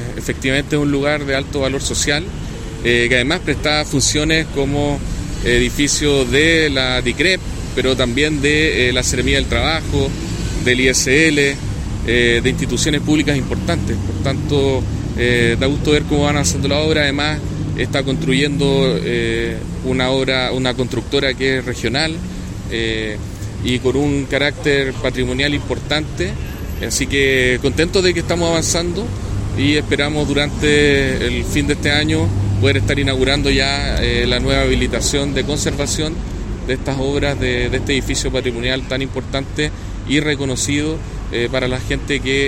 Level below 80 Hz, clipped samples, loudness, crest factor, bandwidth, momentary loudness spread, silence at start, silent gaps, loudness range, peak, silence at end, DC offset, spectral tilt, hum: -28 dBFS; under 0.1%; -17 LUFS; 16 dB; 16 kHz; 9 LU; 0 s; none; 4 LU; 0 dBFS; 0 s; under 0.1%; -4.5 dB/octave; none